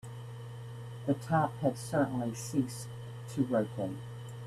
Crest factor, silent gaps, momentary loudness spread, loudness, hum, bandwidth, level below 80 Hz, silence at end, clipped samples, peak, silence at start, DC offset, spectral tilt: 20 dB; none; 14 LU; -34 LUFS; 60 Hz at -45 dBFS; 14.5 kHz; -64 dBFS; 0 s; under 0.1%; -14 dBFS; 0.05 s; under 0.1%; -6.5 dB/octave